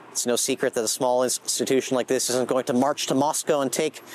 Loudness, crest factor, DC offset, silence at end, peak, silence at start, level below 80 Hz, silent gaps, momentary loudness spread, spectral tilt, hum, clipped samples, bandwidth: -23 LUFS; 14 dB; under 0.1%; 0 s; -8 dBFS; 0 s; -72 dBFS; none; 2 LU; -3 dB/octave; none; under 0.1%; 15.5 kHz